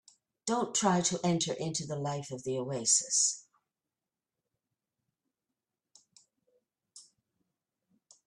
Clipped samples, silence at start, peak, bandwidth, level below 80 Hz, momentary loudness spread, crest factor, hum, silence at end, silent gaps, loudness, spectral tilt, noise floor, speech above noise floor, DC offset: under 0.1%; 0.45 s; -14 dBFS; 12 kHz; -74 dBFS; 11 LU; 22 dB; none; 1.25 s; none; -30 LUFS; -3 dB/octave; under -90 dBFS; over 59 dB; under 0.1%